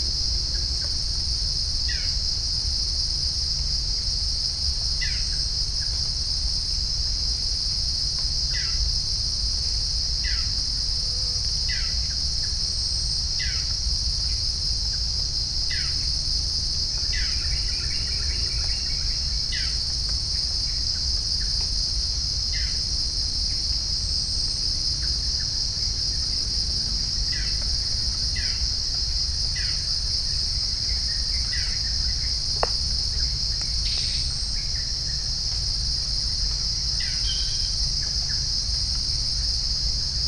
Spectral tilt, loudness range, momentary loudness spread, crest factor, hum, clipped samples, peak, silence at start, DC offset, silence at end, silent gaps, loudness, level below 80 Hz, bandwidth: -1.5 dB/octave; 1 LU; 1 LU; 20 dB; none; under 0.1%; -4 dBFS; 0 s; under 0.1%; 0 s; none; -23 LUFS; -30 dBFS; 10.5 kHz